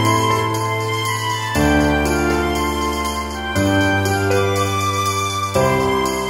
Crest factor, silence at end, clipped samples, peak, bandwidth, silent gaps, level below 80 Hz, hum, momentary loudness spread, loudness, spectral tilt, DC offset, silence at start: 14 dB; 0 s; under 0.1%; -4 dBFS; 16.5 kHz; none; -32 dBFS; none; 4 LU; -18 LUFS; -4.5 dB/octave; under 0.1%; 0 s